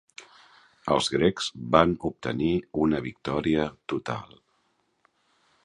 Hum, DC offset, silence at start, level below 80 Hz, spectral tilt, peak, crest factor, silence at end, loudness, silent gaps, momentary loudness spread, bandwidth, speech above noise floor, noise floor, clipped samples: none; under 0.1%; 0.2 s; -50 dBFS; -5.5 dB/octave; -2 dBFS; 26 dB; 1.4 s; -26 LUFS; none; 13 LU; 11 kHz; 45 dB; -71 dBFS; under 0.1%